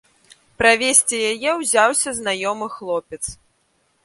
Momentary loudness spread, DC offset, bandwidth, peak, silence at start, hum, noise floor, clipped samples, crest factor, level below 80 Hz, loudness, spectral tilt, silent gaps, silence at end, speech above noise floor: 14 LU; under 0.1%; 12 kHz; 0 dBFS; 0.6 s; none; -65 dBFS; under 0.1%; 20 dB; -52 dBFS; -18 LUFS; -1 dB/octave; none; 0.7 s; 45 dB